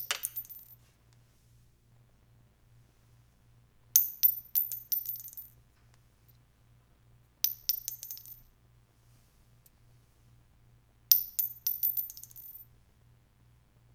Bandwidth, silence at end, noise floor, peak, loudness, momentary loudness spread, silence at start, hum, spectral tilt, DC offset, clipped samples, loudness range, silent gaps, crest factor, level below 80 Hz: over 20 kHz; 1.3 s; -64 dBFS; 0 dBFS; -29 LUFS; 23 LU; 0 s; none; 1.5 dB/octave; under 0.1%; under 0.1%; 9 LU; none; 38 dB; -68 dBFS